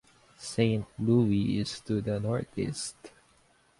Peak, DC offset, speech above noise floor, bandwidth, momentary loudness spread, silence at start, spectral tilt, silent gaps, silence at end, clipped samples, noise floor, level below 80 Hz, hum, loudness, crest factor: -12 dBFS; under 0.1%; 36 dB; 11.5 kHz; 11 LU; 0.4 s; -6.5 dB/octave; none; 0.7 s; under 0.1%; -65 dBFS; -56 dBFS; none; -30 LUFS; 18 dB